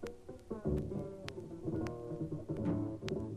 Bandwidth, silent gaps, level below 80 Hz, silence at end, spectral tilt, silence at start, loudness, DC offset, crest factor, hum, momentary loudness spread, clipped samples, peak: 13 kHz; none; -54 dBFS; 0 s; -8 dB/octave; 0 s; -41 LUFS; under 0.1%; 22 dB; none; 9 LU; under 0.1%; -18 dBFS